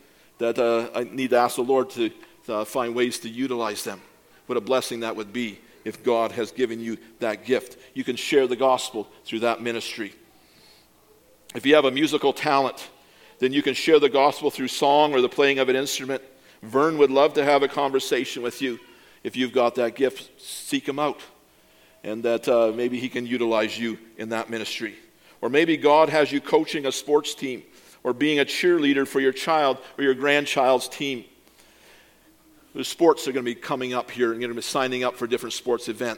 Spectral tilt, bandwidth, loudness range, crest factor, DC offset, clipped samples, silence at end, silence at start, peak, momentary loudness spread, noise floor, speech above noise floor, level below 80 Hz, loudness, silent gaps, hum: -3.5 dB/octave; 17.5 kHz; 6 LU; 20 dB; under 0.1%; under 0.1%; 0 s; 0.4 s; -2 dBFS; 13 LU; -57 dBFS; 34 dB; -70 dBFS; -23 LUFS; none; none